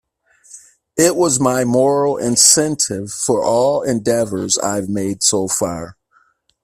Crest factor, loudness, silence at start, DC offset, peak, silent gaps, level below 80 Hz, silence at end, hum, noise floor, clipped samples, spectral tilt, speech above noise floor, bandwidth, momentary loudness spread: 18 dB; -15 LUFS; 0.5 s; under 0.1%; 0 dBFS; none; -52 dBFS; 0.7 s; none; -58 dBFS; under 0.1%; -3 dB/octave; 42 dB; 16 kHz; 11 LU